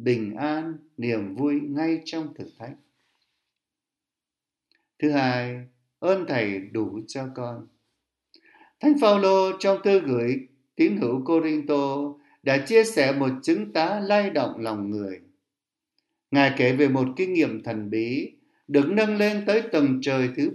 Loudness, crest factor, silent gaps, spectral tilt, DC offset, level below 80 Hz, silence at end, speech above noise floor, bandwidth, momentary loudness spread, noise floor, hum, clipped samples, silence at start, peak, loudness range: -24 LUFS; 20 dB; none; -6 dB/octave; under 0.1%; -72 dBFS; 0 s; 66 dB; 12 kHz; 14 LU; -89 dBFS; none; under 0.1%; 0 s; -4 dBFS; 8 LU